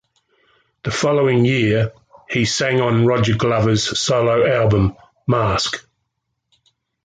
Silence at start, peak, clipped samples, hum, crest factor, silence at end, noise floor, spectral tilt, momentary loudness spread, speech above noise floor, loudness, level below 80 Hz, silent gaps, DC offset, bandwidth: 0.85 s; -4 dBFS; under 0.1%; none; 14 dB; 1.25 s; -74 dBFS; -5 dB/octave; 9 LU; 58 dB; -17 LUFS; -40 dBFS; none; under 0.1%; 9.4 kHz